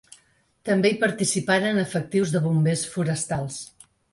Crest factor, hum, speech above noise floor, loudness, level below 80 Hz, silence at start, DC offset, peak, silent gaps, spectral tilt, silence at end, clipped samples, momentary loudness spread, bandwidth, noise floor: 16 dB; none; 39 dB; -23 LUFS; -58 dBFS; 0.65 s; under 0.1%; -8 dBFS; none; -5 dB/octave; 0.45 s; under 0.1%; 11 LU; 11.5 kHz; -62 dBFS